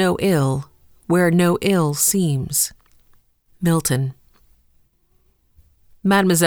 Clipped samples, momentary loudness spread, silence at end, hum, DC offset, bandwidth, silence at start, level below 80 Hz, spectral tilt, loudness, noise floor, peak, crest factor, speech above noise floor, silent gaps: under 0.1%; 8 LU; 0 s; none; under 0.1%; over 20 kHz; 0 s; -50 dBFS; -5 dB/octave; -19 LUFS; -60 dBFS; -2 dBFS; 18 dB; 43 dB; none